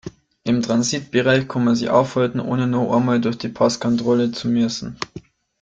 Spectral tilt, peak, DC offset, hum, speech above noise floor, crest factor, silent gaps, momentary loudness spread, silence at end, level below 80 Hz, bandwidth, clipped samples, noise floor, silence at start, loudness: -5.5 dB/octave; -2 dBFS; under 0.1%; none; 22 dB; 18 dB; none; 10 LU; 0.4 s; -54 dBFS; 8.8 kHz; under 0.1%; -41 dBFS; 0.05 s; -19 LUFS